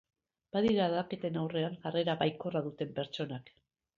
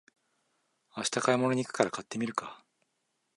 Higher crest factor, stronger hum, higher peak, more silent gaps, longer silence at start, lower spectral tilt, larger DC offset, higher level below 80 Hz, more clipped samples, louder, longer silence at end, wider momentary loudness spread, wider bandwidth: second, 18 dB vs 24 dB; neither; second, -16 dBFS vs -8 dBFS; neither; second, 0.55 s vs 0.95 s; first, -7.5 dB/octave vs -4 dB/octave; neither; first, -70 dBFS vs -76 dBFS; neither; second, -34 LUFS vs -31 LUFS; second, 0.5 s vs 0.8 s; second, 9 LU vs 12 LU; second, 7.4 kHz vs 11.5 kHz